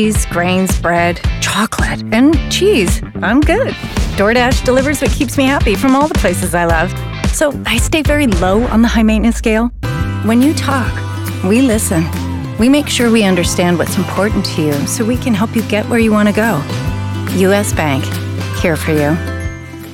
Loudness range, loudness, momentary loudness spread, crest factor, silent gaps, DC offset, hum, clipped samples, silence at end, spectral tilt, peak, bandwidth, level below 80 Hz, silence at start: 2 LU; -13 LUFS; 8 LU; 10 dB; none; under 0.1%; none; under 0.1%; 0 s; -5 dB/octave; -2 dBFS; 17 kHz; -24 dBFS; 0 s